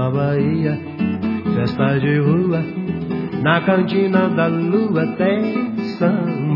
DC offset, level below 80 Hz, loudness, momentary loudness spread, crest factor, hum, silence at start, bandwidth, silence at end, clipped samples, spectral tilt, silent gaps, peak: under 0.1%; -56 dBFS; -18 LUFS; 6 LU; 16 dB; none; 0 s; 5.8 kHz; 0 s; under 0.1%; -10 dB/octave; none; 0 dBFS